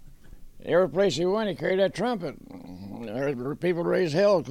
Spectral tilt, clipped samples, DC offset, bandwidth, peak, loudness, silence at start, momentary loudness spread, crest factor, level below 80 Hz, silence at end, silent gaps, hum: -6 dB/octave; under 0.1%; under 0.1%; 14 kHz; -10 dBFS; -26 LUFS; 0 s; 18 LU; 16 dB; -52 dBFS; 0 s; none; none